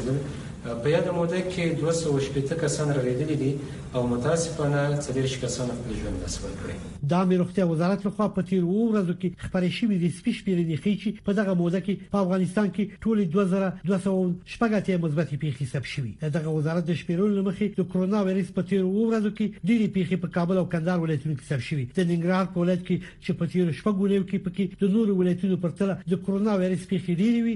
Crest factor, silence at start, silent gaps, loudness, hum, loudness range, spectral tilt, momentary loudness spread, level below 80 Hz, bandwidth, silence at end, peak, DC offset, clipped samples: 14 dB; 0 s; none; -26 LUFS; none; 2 LU; -7 dB/octave; 6 LU; -50 dBFS; 11 kHz; 0 s; -10 dBFS; under 0.1%; under 0.1%